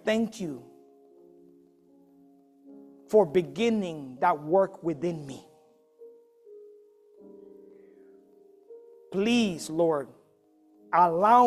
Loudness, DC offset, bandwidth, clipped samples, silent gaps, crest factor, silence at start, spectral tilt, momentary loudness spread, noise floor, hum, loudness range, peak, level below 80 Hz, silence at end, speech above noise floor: -27 LUFS; under 0.1%; 14 kHz; under 0.1%; none; 22 dB; 0.05 s; -5.5 dB/octave; 16 LU; -63 dBFS; none; 10 LU; -8 dBFS; -70 dBFS; 0 s; 38 dB